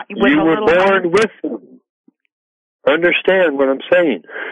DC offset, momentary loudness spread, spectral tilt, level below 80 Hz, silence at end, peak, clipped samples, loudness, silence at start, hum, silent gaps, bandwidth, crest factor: under 0.1%; 11 LU; -5.5 dB/octave; -50 dBFS; 0 s; -2 dBFS; under 0.1%; -14 LUFS; 0 s; none; 1.89-2.04 s, 2.32-2.79 s; 11 kHz; 12 dB